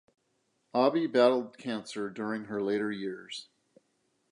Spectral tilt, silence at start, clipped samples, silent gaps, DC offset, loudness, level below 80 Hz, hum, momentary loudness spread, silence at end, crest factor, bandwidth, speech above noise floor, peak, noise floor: -5.5 dB/octave; 0.75 s; under 0.1%; none; under 0.1%; -30 LUFS; -80 dBFS; none; 13 LU; 0.9 s; 20 dB; 11 kHz; 46 dB; -10 dBFS; -76 dBFS